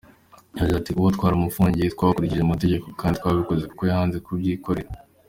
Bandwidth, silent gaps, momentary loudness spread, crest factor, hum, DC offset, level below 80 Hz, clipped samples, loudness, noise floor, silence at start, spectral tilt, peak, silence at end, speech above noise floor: 16.5 kHz; none; 6 LU; 18 dB; none; under 0.1%; -40 dBFS; under 0.1%; -23 LUFS; -52 dBFS; 0.55 s; -8 dB/octave; -4 dBFS; 0.3 s; 30 dB